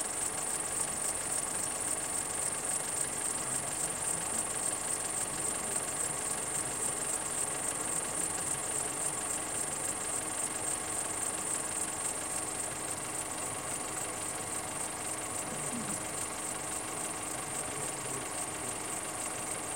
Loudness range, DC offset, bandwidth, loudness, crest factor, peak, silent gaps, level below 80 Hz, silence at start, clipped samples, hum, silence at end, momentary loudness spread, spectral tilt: 3 LU; under 0.1%; 16.5 kHz; -33 LUFS; 18 dB; -18 dBFS; none; -62 dBFS; 0 s; under 0.1%; none; 0 s; 4 LU; -1.5 dB/octave